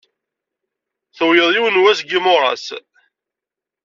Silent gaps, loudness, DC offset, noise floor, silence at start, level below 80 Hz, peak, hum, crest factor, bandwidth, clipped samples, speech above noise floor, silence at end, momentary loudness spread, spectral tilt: none; -14 LUFS; under 0.1%; -86 dBFS; 1.15 s; -70 dBFS; -2 dBFS; none; 16 dB; 7.6 kHz; under 0.1%; 72 dB; 1.05 s; 14 LU; 0.5 dB/octave